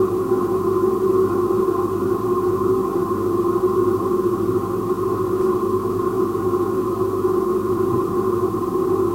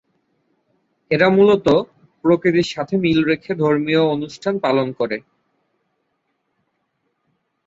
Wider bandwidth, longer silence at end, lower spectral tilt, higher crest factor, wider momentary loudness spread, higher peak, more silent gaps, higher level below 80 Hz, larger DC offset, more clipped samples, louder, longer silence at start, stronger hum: first, 16 kHz vs 7.8 kHz; second, 0 s vs 2.45 s; first, -8 dB/octave vs -6.5 dB/octave; second, 12 dB vs 18 dB; second, 3 LU vs 10 LU; second, -8 dBFS vs -2 dBFS; neither; first, -46 dBFS vs -56 dBFS; neither; neither; about the same, -20 LUFS vs -18 LUFS; second, 0 s vs 1.1 s; neither